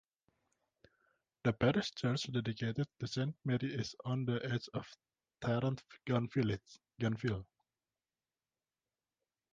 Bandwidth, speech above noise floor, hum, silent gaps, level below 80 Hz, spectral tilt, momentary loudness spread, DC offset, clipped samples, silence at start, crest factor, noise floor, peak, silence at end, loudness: 7.6 kHz; over 53 dB; none; none; -66 dBFS; -6.5 dB/octave; 10 LU; under 0.1%; under 0.1%; 1.45 s; 20 dB; under -90 dBFS; -18 dBFS; 2.1 s; -38 LUFS